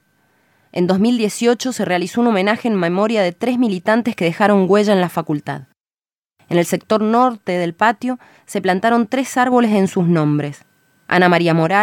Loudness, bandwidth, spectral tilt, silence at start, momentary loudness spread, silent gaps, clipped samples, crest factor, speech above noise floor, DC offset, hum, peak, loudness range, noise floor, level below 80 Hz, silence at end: -16 LUFS; 17 kHz; -6 dB/octave; 0.75 s; 8 LU; 5.80-5.85 s, 6.18-6.23 s; under 0.1%; 14 dB; over 74 dB; under 0.1%; none; -2 dBFS; 3 LU; under -90 dBFS; -68 dBFS; 0 s